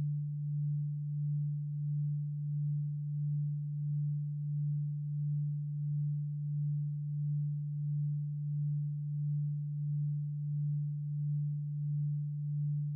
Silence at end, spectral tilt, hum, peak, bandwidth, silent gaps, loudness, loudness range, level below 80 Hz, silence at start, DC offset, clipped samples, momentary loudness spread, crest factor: 0 s; -30.5 dB/octave; none; -30 dBFS; 0.3 kHz; none; -36 LUFS; 0 LU; -76 dBFS; 0 s; under 0.1%; under 0.1%; 2 LU; 6 dB